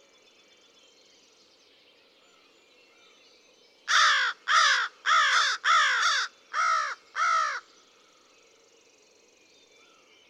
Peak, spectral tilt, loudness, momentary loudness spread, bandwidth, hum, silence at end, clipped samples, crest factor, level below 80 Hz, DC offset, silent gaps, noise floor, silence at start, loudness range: -10 dBFS; 4.5 dB/octave; -23 LUFS; 10 LU; 12 kHz; none; 2.7 s; under 0.1%; 20 dB; under -90 dBFS; under 0.1%; none; -61 dBFS; 3.85 s; 9 LU